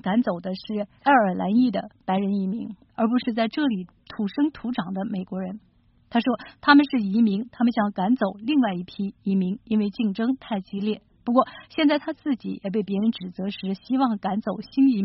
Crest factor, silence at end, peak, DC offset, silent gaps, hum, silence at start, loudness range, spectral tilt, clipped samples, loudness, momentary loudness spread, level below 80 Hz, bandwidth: 22 dB; 0 s; -2 dBFS; under 0.1%; none; none; 0.05 s; 5 LU; -5 dB/octave; under 0.1%; -24 LUFS; 11 LU; -62 dBFS; 5.8 kHz